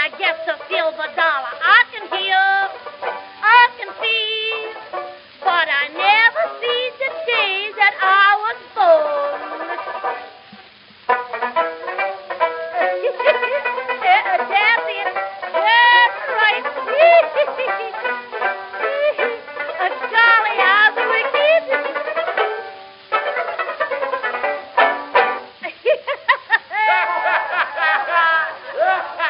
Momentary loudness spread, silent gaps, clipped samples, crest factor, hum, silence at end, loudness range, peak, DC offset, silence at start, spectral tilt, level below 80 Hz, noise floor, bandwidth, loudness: 12 LU; none; under 0.1%; 18 dB; none; 0 s; 6 LU; 0 dBFS; under 0.1%; 0 s; 3.5 dB/octave; -74 dBFS; -44 dBFS; 5.6 kHz; -17 LUFS